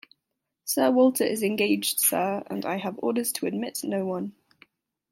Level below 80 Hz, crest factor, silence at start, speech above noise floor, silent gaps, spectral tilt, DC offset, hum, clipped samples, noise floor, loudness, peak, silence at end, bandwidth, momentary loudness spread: -76 dBFS; 18 dB; 0.65 s; 57 dB; none; -3.5 dB/octave; under 0.1%; none; under 0.1%; -82 dBFS; -25 LUFS; -8 dBFS; 0.8 s; 16.5 kHz; 10 LU